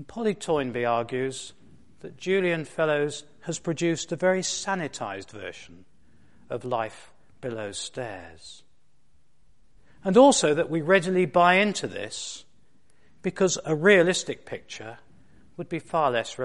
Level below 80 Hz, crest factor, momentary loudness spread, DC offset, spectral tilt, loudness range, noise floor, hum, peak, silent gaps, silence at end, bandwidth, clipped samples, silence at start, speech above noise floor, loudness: -62 dBFS; 22 dB; 21 LU; 0.3%; -4 dB/octave; 13 LU; -69 dBFS; none; -4 dBFS; none; 0 s; 11.5 kHz; under 0.1%; 0 s; 44 dB; -25 LUFS